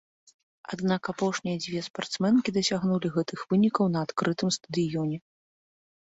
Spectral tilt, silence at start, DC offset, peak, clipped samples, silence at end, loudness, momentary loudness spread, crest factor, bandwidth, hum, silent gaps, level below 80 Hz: -5.5 dB/octave; 0.7 s; under 0.1%; -12 dBFS; under 0.1%; 0.95 s; -28 LUFS; 9 LU; 16 dB; 8 kHz; none; 1.90-1.94 s; -66 dBFS